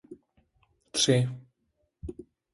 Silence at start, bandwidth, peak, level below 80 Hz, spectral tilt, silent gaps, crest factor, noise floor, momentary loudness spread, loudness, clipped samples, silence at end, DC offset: 0.1 s; 11.5 kHz; -10 dBFS; -56 dBFS; -4 dB/octave; none; 22 dB; -76 dBFS; 22 LU; -26 LUFS; under 0.1%; 0.3 s; under 0.1%